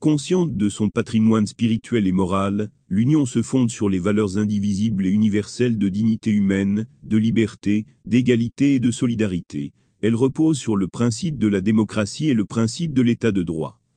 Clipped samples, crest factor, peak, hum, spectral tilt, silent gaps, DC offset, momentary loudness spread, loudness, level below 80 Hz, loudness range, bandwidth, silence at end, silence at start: under 0.1%; 16 dB; -4 dBFS; none; -6.5 dB/octave; none; under 0.1%; 5 LU; -21 LUFS; -54 dBFS; 1 LU; 9.8 kHz; 0.25 s; 0 s